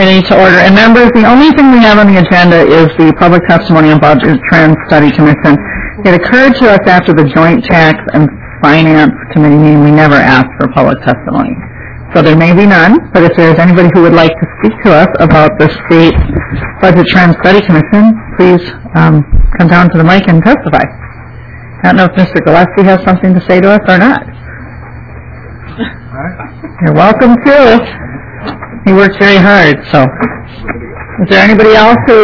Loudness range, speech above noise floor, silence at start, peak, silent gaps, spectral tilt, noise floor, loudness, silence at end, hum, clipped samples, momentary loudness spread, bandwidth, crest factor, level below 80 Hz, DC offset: 5 LU; 22 dB; 0 s; 0 dBFS; none; -8 dB/octave; -26 dBFS; -5 LUFS; 0 s; none; 20%; 15 LU; 5.4 kHz; 6 dB; -24 dBFS; 1%